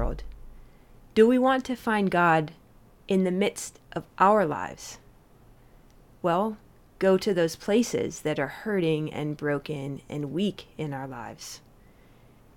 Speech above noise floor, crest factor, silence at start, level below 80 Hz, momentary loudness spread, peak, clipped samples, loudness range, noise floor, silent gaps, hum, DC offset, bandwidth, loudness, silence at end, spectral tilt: 29 dB; 20 dB; 0 s; -46 dBFS; 17 LU; -6 dBFS; under 0.1%; 6 LU; -55 dBFS; none; none; under 0.1%; 17 kHz; -26 LUFS; 1 s; -5.5 dB/octave